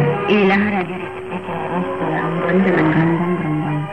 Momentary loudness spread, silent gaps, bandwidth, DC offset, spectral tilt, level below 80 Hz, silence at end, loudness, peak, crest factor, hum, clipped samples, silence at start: 11 LU; none; 8.6 kHz; 0.6%; -8.5 dB/octave; -50 dBFS; 0 s; -18 LUFS; -4 dBFS; 12 dB; none; under 0.1%; 0 s